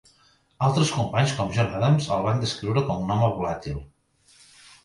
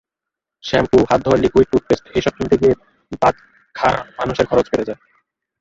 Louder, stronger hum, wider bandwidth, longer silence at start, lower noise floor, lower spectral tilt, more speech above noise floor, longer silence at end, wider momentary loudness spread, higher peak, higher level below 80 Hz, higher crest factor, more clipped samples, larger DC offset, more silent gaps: second, -24 LUFS vs -17 LUFS; neither; first, 11.5 kHz vs 7.8 kHz; about the same, 0.6 s vs 0.65 s; second, -61 dBFS vs -84 dBFS; about the same, -6 dB/octave vs -6.5 dB/octave; second, 38 dB vs 68 dB; first, 1 s vs 0.65 s; second, 8 LU vs 15 LU; second, -8 dBFS vs -2 dBFS; second, -48 dBFS vs -40 dBFS; about the same, 16 dB vs 16 dB; neither; neither; neither